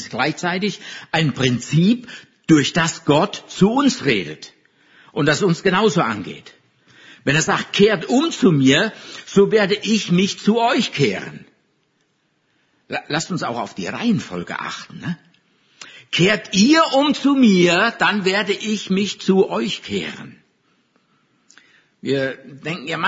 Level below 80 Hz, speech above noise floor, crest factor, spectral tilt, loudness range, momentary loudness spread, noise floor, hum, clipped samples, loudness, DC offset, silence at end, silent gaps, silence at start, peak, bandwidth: -58 dBFS; 48 dB; 18 dB; -5 dB/octave; 9 LU; 15 LU; -66 dBFS; none; under 0.1%; -18 LUFS; under 0.1%; 0 s; none; 0 s; -2 dBFS; 7.8 kHz